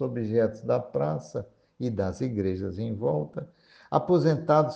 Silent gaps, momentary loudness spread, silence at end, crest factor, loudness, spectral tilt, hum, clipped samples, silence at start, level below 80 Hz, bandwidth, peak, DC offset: none; 14 LU; 0 s; 22 dB; -28 LUFS; -8.5 dB/octave; none; under 0.1%; 0 s; -62 dBFS; 8.2 kHz; -6 dBFS; under 0.1%